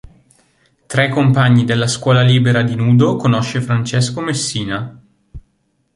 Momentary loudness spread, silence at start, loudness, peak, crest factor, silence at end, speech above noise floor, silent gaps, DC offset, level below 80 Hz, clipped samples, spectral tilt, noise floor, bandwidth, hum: 9 LU; 0.05 s; -15 LUFS; -2 dBFS; 14 dB; 0.55 s; 50 dB; none; under 0.1%; -46 dBFS; under 0.1%; -5.5 dB/octave; -63 dBFS; 11.5 kHz; none